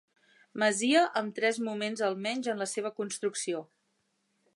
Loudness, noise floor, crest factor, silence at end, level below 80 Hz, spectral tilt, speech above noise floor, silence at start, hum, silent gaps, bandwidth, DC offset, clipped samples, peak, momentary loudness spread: -30 LUFS; -76 dBFS; 20 dB; 0.9 s; -86 dBFS; -3 dB/octave; 46 dB; 0.55 s; none; none; 11.5 kHz; under 0.1%; under 0.1%; -12 dBFS; 10 LU